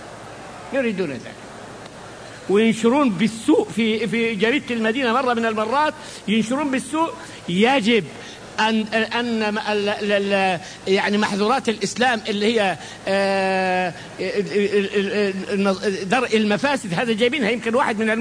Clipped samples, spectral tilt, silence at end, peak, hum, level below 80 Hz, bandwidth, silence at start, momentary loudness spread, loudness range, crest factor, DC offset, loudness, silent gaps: under 0.1%; -4.5 dB/octave; 0 s; -4 dBFS; none; -58 dBFS; 10.5 kHz; 0 s; 14 LU; 2 LU; 16 dB; under 0.1%; -20 LUFS; none